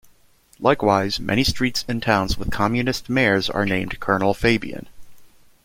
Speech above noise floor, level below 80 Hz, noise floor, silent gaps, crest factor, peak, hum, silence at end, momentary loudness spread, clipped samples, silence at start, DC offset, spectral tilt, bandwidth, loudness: 35 dB; -38 dBFS; -55 dBFS; none; 20 dB; -2 dBFS; none; 0.35 s; 5 LU; under 0.1%; 0.6 s; under 0.1%; -5 dB/octave; 16.5 kHz; -21 LUFS